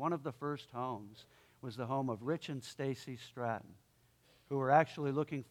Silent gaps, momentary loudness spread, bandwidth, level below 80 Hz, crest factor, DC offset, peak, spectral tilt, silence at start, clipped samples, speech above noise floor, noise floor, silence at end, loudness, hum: none; 16 LU; 16 kHz; -78 dBFS; 26 dB; under 0.1%; -14 dBFS; -6.5 dB/octave; 0 s; under 0.1%; 32 dB; -70 dBFS; 0.05 s; -38 LUFS; none